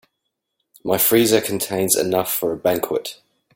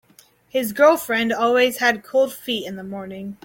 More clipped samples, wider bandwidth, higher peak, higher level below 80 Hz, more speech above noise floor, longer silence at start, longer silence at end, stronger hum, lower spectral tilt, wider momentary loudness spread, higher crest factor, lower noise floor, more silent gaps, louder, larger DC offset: neither; about the same, 17 kHz vs 17 kHz; about the same, -2 dBFS vs -4 dBFS; about the same, -58 dBFS vs -62 dBFS; first, 58 dB vs 34 dB; first, 0.85 s vs 0.55 s; first, 0.4 s vs 0.1 s; neither; about the same, -3.5 dB/octave vs -3.5 dB/octave; second, 10 LU vs 16 LU; about the same, 20 dB vs 18 dB; first, -77 dBFS vs -54 dBFS; neither; about the same, -19 LUFS vs -19 LUFS; neither